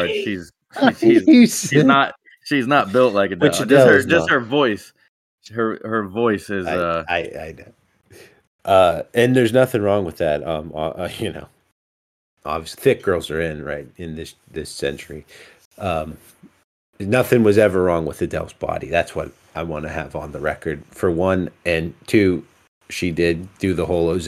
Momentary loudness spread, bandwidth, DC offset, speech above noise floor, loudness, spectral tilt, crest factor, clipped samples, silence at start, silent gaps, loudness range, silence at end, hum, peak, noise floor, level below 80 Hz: 17 LU; 15.5 kHz; under 0.1%; 30 dB; -18 LUFS; -5.5 dB/octave; 18 dB; under 0.1%; 0 s; 5.08-5.38 s, 8.47-8.59 s, 11.72-12.37 s, 15.65-15.71 s, 16.64-16.93 s, 22.68-22.81 s; 9 LU; 0 s; none; 0 dBFS; -48 dBFS; -46 dBFS